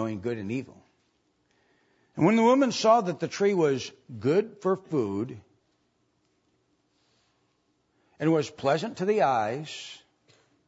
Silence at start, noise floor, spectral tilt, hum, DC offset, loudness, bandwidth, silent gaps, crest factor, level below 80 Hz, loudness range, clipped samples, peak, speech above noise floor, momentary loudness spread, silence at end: 0 s; -72 dBFS; -6 dB/octave; none; under 0.1%; -26 LUFS; 8 kHz; none; 20 dB; -74 dBFS; 10 LU; under 0.1%; -10 dBFS; 46 dB; 16 LU; 0.7 s